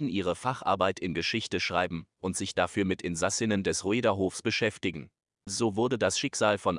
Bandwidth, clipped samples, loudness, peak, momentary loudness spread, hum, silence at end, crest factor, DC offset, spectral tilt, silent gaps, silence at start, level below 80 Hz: 11.5 kHz; under 0.1%; -29 LUFS; -10 dBFS; 7 LU; none; 0 s; 18 dB; under 0.1%; -4 dB/octave; none; 0 s; -64 dBFS